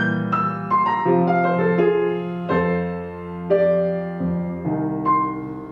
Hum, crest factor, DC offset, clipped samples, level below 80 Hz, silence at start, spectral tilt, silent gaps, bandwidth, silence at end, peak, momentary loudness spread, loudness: none; 16 dB; under 0.1%; under 0.1%; -52 dBFS; 0 s; -9.5 dB/octave; none; 5.2 kHz; 0 s; -6 dBFS; 8 LU; -21 LUFS